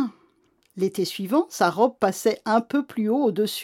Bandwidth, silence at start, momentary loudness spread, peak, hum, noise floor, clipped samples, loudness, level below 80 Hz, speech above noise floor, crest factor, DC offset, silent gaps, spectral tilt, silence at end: 17 kHz; 0 s; 7 LU; -6 dBFS; none; -64 dBFS; under 0.1%; -23 LUFS; -74 dBFS; 41 dB; 18 dB; under 0.1%; none; -5 dB/octave; 0 s